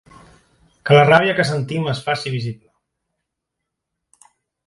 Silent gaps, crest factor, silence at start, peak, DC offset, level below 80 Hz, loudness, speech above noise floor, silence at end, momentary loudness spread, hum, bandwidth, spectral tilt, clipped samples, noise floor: none; 20 dB; 0.85 s; 0 dBFS; under 0.1%; -58 dBFS; -16 LUFS; 64 dB; 2.15 s; 19 LU; none; 11.5 kHz; -6 dB/octave; under 0.1%; -80 dBFS